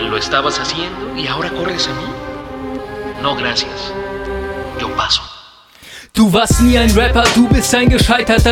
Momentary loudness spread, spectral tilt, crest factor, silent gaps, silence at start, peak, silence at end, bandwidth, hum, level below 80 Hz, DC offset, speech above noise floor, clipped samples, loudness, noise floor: 15 LU; -4.5 dB/octave; 14 dB; none; 0 s; 0 dBFS; 0 s; 17.5 kHz; none; -24 dBFS; under 0.1%; 27 dB; under 0.1%; -14 LUFS; -41 dBFS